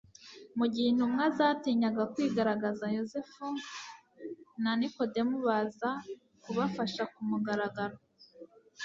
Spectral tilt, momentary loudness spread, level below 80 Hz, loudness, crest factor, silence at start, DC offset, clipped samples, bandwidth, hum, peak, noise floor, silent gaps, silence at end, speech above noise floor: -6 dB/octave; 17 LU; -74 dBFS; -32 LUFS; 20 dB; 0.2 s; under 0.1%; under 0.1%; 7.6 kHz; none; -14 dBFS; -55 dBFS; none; 0 s; 24 dB